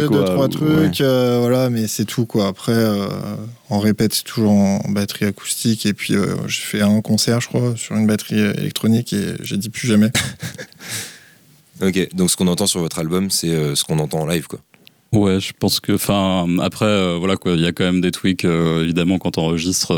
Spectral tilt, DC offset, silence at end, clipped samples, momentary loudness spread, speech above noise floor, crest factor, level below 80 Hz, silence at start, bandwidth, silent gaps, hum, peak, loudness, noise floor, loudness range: -5 dB/octave; under 0.1%; 0 s; under 0.1%; 7 LU; 32 dB; 12 dB; -50 dBFS; 0 s; 19.5 kHz; none; none; -6 dBFS; -18 LUFS; -50 dBFS; 2 LU